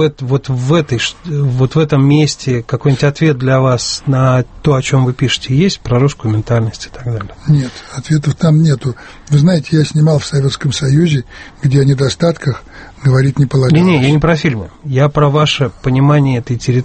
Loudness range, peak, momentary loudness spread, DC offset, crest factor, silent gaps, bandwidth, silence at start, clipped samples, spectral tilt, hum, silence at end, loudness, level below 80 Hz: 3 LU; 0 dBFS; 8 LU; under 0.1%; 12 dB; none; 8.8 kHz; 0 s; under 0.1%; -6.5 dB/octave; none; 0 s; -13 LUFS; -36 dBFS